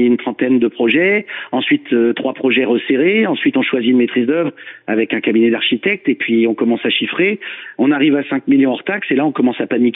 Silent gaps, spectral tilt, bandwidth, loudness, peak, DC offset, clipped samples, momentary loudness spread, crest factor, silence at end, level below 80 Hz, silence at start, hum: none; -9 dB/octave; 4 kHz; -15 LUFS; -4 dBFS; under 0.1%; under 0.1%; 5 LU; 12 dB; 0 s; -64 dBFS; 0 s; none